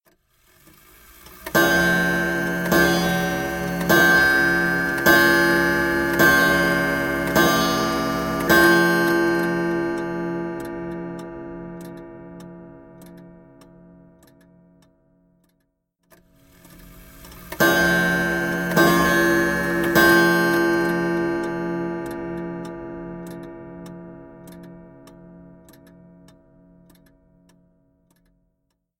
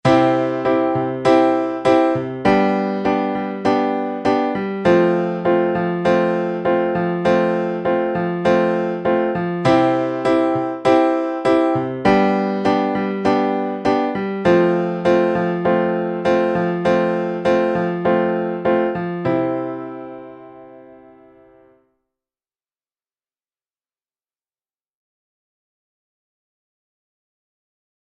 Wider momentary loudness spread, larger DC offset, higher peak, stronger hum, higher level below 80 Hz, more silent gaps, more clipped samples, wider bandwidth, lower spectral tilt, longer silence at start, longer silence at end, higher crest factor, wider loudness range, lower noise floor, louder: first, 22 LU vs 5 LU; neither; about the same, -2 dBFS vs -2 dBFS; neither; first, -46 dBFS vs -54 dBFS; neither; neither; first, 17 kHz vs 9.2 kHz; second, -4.5 dB/octave vs -7.5 dB/octave; first, 1.3 s vs 0.05 s; second, 3.55 s vs 7.25 s; about the same, 20 dB vs 16 dB; first, 18 LU vs 4 LU; second, -73 dBFS vs under -90 dBFS; about the same, -19 LUFS vs -18 LUFS